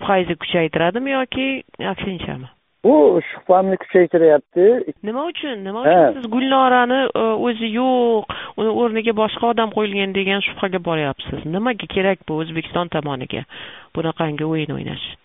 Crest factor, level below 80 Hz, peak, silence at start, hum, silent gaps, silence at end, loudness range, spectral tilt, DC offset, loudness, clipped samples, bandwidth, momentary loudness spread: 18 dB; -52 dBFS; 0 dBFS; 0 s; none; none; 0.1 s; 7 LU; -4 dB/octave; 0.1%; -18 LUFS; under 0.1%; 4 kHz; 12 LU